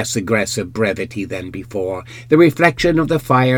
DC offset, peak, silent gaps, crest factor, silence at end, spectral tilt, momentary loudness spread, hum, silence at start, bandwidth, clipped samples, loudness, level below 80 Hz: under 0.1%; 0 dBFS; none; 16 dB; 0 s; -5.5 dB/octave; 13 LU; none; 0 s; 18.5 kHz; under 0.1%; -17 LUFS; -42 dBFS